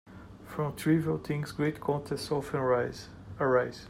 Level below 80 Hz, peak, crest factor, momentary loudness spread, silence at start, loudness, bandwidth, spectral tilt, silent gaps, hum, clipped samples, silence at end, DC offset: -58 dBFS; -14 dBFS; 18 dB; 16 LU; 0.05 s; -31 LUFS; 16 kHz; -6.5 dB/octave; none; none; under 0.1%; 0 s; under 0.1%